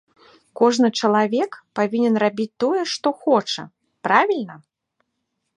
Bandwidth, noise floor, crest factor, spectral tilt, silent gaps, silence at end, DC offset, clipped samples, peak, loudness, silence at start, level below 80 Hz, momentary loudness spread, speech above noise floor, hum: 10.5 kHz; -76 dBFS; 20 dB; -4.5 dB/octave; none; 1 s; under 0.1%; under 0.1%; -2 dBFS; -20 LUFS; 0.55 s; -74 dBFS; 10 LU; 56 dB; none